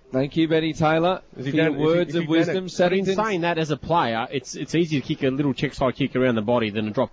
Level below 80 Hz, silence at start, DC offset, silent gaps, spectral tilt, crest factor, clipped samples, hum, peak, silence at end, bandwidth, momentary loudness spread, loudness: -50 dBFS; 0.1 s; under 0.1%; none; -6 dB/octave; 12 dB; under 0.1%; none; -10 dBFS; 0.05 s; 8 kHz; 5 LU; -22 LUFS